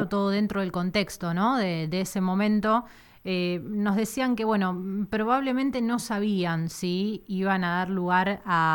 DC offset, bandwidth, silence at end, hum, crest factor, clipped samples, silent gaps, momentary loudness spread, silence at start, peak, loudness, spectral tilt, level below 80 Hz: under 0.1%; 18 kHz; 0 s; none; 16 dB; under 0.1%; none; 5 LU; 0 s; -10 dBFS; -26 LUFS; -6 dB/octave; -58 dBFS